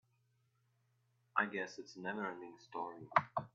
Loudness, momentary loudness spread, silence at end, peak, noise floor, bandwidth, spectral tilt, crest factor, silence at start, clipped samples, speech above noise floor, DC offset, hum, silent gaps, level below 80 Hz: -40 LUFS; 11 LU; 0.05 s; -14 dBFS; -78 dBFS; 7.6 kHz; -3.5 dB/octave; 28 dB; 1.35 s; under 0.1%; 37 dB; under 0.1%; none; none; -84 dBFS